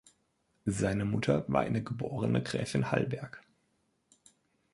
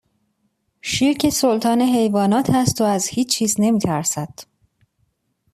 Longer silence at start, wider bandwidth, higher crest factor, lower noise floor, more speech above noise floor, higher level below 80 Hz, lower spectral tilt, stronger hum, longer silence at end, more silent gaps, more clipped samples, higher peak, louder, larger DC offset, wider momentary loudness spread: second, 0.65 s vs 0.85 s; second, 11.5 kHz vs 14.5 kHz; first, 22 dB vs 16 dB; first, -75 dBFS vs -69 dBFS; second, 44 dB vs 51 dB; second, -58 dBFS vs -52 dBFS; first, -6.5 dB/octave vs -4.5 dB/octave; neither; first, 1.35 s vs 1.1 s; neither; neither; second, -12 dBFS vs -4 dBFS; second, -32 LUFS vs -18 LUFS; neither; first, 9 LU vs 6 LU